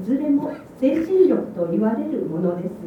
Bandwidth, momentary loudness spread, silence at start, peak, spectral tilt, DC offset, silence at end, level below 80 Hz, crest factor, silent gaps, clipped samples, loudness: 6.4 kHz; 8 LU; 0 s; -6 dBFS; -9.5 dB/octave; under 0.1%; 0 s; -58 dBFS; 16 dB; none; under 0.1%; -21 LUFS